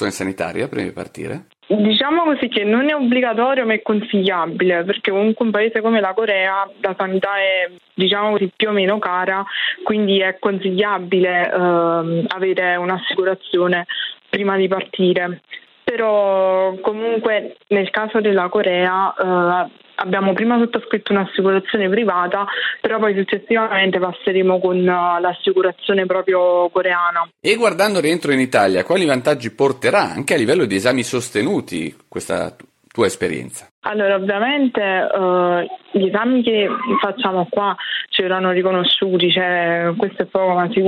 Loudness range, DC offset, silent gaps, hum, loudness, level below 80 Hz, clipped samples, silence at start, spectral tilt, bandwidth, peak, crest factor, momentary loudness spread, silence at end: 2 LU; under 0.1%; 33.71-33.82 s; none; -17 LUFS; -64 dBFS; under 0.1%; 0 s; -5 dB/octave; 13 kHz; -2 dBFS; 16 dB; 7 LU; 0 s